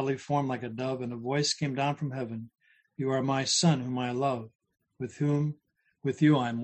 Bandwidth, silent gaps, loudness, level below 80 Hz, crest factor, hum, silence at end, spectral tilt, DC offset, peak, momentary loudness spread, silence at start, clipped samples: 9.2 kHz; 4.55-4.59 s; -29 LUFS; -68 dBFS; 18 dB; none; 0 s; -5 dB/octave; under 0.1%; -12 dBFS; 14 LU; 0 s; under 0.1%